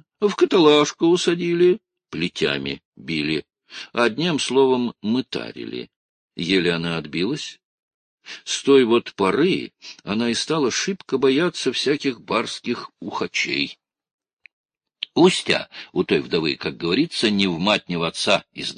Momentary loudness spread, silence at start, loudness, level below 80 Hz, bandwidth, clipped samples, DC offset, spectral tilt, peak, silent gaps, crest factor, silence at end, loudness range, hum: 13 LU; 0.2 s; -21 LUFS; -58 dBFS; 10.5 kHz; under 0.1%; under 0.1%; -4.5 dB/octave; -2 dBFS; 2.85-2.92 s, 5.96-6.28 s, 7.65-8.18 s, 14.13-14.18 s, 14.33-14.37 s, 14.53-14.64 s; 18 dB; 0.05 s; 5 LU; none